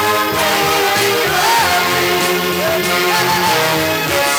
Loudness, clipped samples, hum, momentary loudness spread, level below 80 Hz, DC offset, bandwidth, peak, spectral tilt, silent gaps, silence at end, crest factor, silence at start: -13 LUFS; under 0.1%; none; 3 LU; -46 dBFS; under 0.1%; over 20 kHz; -2 dBFS; -2.5 dB/octave; none; 0 s; 12 dB; 0 s